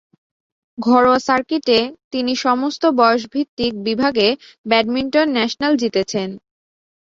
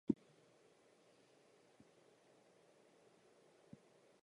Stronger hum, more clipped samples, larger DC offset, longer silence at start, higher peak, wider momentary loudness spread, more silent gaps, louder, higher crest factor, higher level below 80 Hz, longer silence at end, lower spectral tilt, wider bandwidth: neither; neither; neither; first, 0.8 s vs 0.1 s; first, -2 dBFS vs -20 dBFS; second, 10 LU vs 26 LU; first, 2.04-2.11 s, 3.49-3.57 s, 4.58-4.64 s vs none; first, -17 LUFS vs -44 LUFS; second, 16 dB vs 32 dB; first, -56 dBFS vs -84 dBFS; second, 0.75 s vs 4.1 s; second, -4 dB/octave vs -7.5 dB/octave; second, 7.6 kHz vs 11 kHz